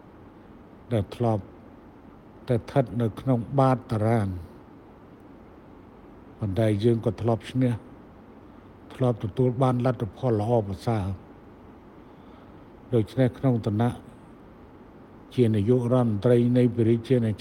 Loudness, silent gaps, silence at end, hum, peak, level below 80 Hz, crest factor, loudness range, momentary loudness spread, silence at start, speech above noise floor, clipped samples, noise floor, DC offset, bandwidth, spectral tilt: -25 LUFS; none; 0.05 s; none; -8 dBFS; -54 dBFS; 18 dB; 4 LU; 11 LU; 0.25 s; 25 dB; under 0.1%; -48 dBFS; under 0.1%; 11.5 kHz; -9 dB/octave